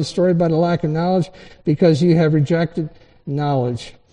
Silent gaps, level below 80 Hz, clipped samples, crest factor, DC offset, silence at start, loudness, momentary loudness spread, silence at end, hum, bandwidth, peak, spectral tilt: none; -50 dBFS; under 0.1%; 16 dB; under 0.1%; 0 s; -18 LUFS; 13 LU; 0.2 s; none; 9.6 kHz; -2 dBFS; -8 dB/octave